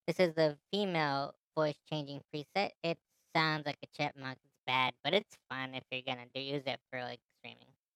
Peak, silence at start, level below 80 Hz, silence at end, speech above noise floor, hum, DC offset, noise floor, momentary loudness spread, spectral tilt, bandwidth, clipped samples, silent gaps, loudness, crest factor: -16 dBFS; 0.05 s; -84 dBFS; 0.4 s; 20 dB; none; under 0.1%; -55 dBFS; 13 LU; -5.5 dB/octave; 16 kHz; under 0.1%; 1.43-1.51 s, 2.77-2.81 s, 4.59-4.67 s, 7.25-7.29 s; -36 LUFS; 22 dB